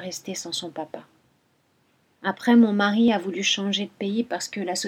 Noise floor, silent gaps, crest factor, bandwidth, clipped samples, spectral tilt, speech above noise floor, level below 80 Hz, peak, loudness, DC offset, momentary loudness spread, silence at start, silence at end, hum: -66 dBFS; none; 18 dB; 14 kHz; under 0.1%; -4 dB/octave; 42 dB; -74 dBFS; -6 dBFS; -23 LUFS; under 0.1%; 15 LU; 0 s; 0 s; none